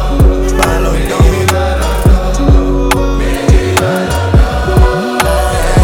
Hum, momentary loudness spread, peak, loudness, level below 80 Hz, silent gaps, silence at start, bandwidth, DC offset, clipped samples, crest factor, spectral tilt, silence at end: none; 3 LU; 0 dBFS; -11 LUFS; -12 dBFS; none; 0 s; 17.5 kHz; under 0.1%; 0.4%; 10 dB; -5.5 dB/octave; 0 s